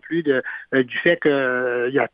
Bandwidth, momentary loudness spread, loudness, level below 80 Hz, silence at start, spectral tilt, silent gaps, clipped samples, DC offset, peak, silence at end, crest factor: 5.2 kHz; 4 LU; -20 LUFS; -66 dBFS; 0.05 s; -9 dB/octave; none; under 0.1%; under 0.1%; -4 dBFS; 0.05 s; 16 dB